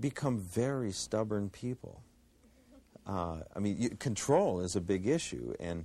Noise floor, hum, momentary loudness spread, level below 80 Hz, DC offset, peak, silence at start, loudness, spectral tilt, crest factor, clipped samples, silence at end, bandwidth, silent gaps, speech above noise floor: -64 dBFS; none; 11 LU; -58 dBFS; under 0.1%; -16 dBFS; 0 s; -34 LUFS; -5.5 dB/octave; 18 dB; under 0.1%; 0 s; 14.5 kHz; none; 30 dB